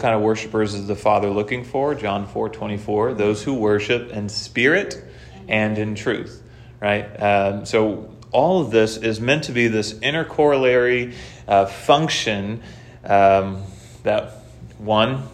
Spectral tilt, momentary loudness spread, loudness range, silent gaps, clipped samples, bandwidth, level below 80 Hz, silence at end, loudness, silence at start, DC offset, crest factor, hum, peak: -5 dB/octave; 12 LU; 3 LU; none; under 0.1%; 13.5 kHz; -50 dBFS; 0 s; -20 LUFS; 0 s; under 0.1%; 20 dB; none; -2 dBFS